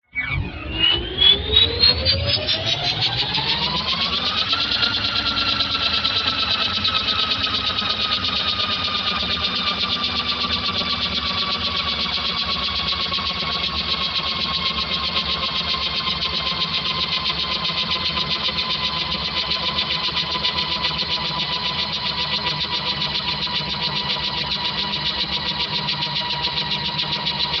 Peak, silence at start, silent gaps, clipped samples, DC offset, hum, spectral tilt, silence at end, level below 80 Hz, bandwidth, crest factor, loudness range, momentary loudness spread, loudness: -2 dBFS; 0.15 s; none; under 0.1%; under 0.1%; none; -3.5 dB/octave; 0 s; -40 dBFS; 7.4 kHz; 20 dB; 4 LU; 4 LU; -19 LUFS